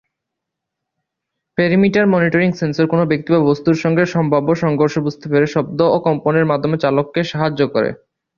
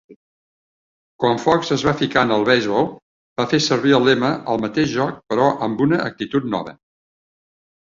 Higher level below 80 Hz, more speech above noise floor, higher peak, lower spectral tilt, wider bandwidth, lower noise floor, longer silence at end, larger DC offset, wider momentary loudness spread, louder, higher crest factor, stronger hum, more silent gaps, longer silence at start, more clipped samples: about the same, -54 dBFS vs -54 dBFS; second, 65 dB vs over 72 dB; about the same, -2 dBFS vs -2 dBFS; first, -7.5 dB/octave vs -5.5 dB/octave; about the same, 7.2 kHz vs 7.6 kHz; second, -80 dBFS vs under -90 dBFS; second, 0.45 s vs 1.1 s; neither; second, 5 LU vs 8 LU; first, -16 LUFS vs -19 LUFS; about the same, 14 dB vs 18 dB; neither; second, none vs 0.16-1.19 s, 3.02-3.36 s; first, 1.6 s vs 0.1 s; neither